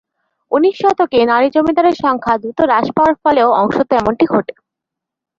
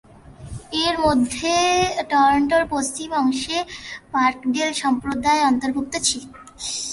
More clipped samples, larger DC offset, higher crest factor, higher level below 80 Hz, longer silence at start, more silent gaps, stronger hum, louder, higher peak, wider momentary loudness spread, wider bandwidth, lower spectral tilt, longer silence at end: neither; neither; about the same, 14 dB vs 16 dB; about the same, -48 dBFS vs -46 dBFS; about the same, 0.5 s vs 0.4 s; neither; neither; first, -13 LUFS vs -20 LUFS; first, -2 dBFS vs -6 dBFS; second, 5 LU vs 10 LU; second, 7.6 kHz vs 11.5 kHz; first, -6.5 dB/octave vs -3 dB/octave; first, 0.85 s vs 0 s